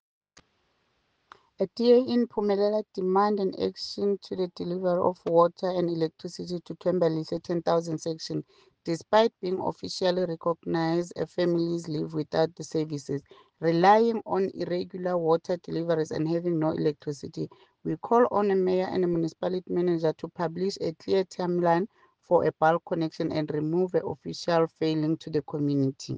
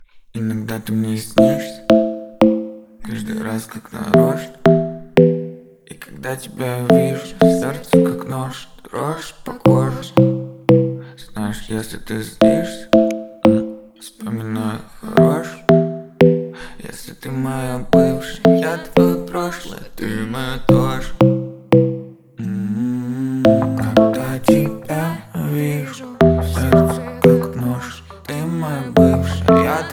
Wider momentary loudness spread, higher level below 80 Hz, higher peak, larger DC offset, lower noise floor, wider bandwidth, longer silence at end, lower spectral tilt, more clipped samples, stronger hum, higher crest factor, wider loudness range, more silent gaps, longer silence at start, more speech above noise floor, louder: second, 10 LU vs 16 LU; second, -68 dBFS vs -38 dBFS; second, -8 dBFS vs 0 dBFS; neither; first, -72 dBFS vs -39 dBFS; second, 9.2 kHz vs over 20 kHz; about the same, 0 s vs 0 s; about the same, -6.5 dB/octave vs -7 dB/octave; neither; neither; about the same, 18 dB vs 18 dB; about the same, 3 LU vs 2 LU; neither; first, 1.6 s vs 0 s; first, 46 dB vs 22 dB; second, -27 LUFS vs -17 LUFS